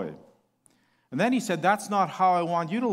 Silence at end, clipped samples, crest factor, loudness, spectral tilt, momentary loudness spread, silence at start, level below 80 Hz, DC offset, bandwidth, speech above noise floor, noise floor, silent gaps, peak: 0 s; under 0.1%; 18 dB; -25 LUFS; -5.5 dB/octave; 7 LU; 0 s; -76 dBFS; under 0.1%; 16 kHz; 41 dB; -66 dBFS; none; -10 dBFS